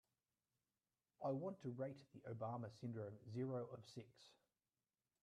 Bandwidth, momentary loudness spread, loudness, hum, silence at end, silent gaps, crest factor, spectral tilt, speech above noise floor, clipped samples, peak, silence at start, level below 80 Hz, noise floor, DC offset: 11.5 kHz; 13 LU; -50 LUFS; none; 0.9 s; none; 18 dB; -8 dB/octave; over 40 dB; under 0.1%; -34 dBFS; 1.2 s; -90 dBFS; under -90 dBFS; under 0.1%